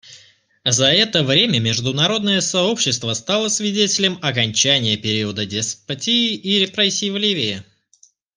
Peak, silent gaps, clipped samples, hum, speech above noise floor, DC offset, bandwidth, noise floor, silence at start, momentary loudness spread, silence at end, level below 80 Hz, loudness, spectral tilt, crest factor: 0 dBFS; none; under 0.1%; none; 37 dB; under 0.1%; 10.5 kHz; -55 dBFS; 0.05 s; 8 LU; 0.75 s; -60 dBFS; -17 LUFS; -3 dB/octave; 20 dB